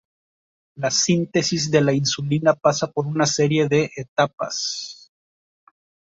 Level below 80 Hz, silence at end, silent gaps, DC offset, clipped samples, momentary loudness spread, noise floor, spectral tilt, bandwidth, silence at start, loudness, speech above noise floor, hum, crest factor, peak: -60 dBFS; 1.15 s; 4.08-4.16 s; under 0.1%; under 0.1%; 7 LU; under -90 dBFS; -4 dB/octave; 8 kHz; 0.75 s; -20 LUFS; over 70 dB; none; 18 dB; -4 dBFS